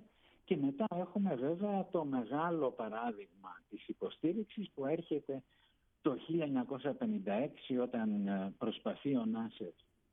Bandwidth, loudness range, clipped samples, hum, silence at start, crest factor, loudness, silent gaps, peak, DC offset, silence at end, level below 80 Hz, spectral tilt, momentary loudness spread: 3.9 kHz; 3 LU; under 0.1%; none; 0 s; 18 dB; -38 LUFS; none; -20 dBFS; under 0.1%; 0.4 s; -78 dBFS; -5.5 dB/octave; 10 LU